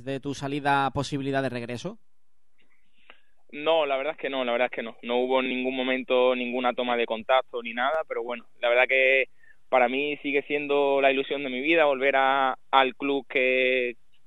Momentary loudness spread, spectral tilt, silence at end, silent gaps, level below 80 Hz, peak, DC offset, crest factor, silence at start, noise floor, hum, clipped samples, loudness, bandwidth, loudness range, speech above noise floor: 10 LU; -5 dB/octave; 0.35 s; none; -66 dBFS; -4 dBFS; 0.4%; 22 dB; 0 s; -80 dBFS; none; under 0.1%; -25 LUFS; 11.5 kHz; 7 LU; 55 dB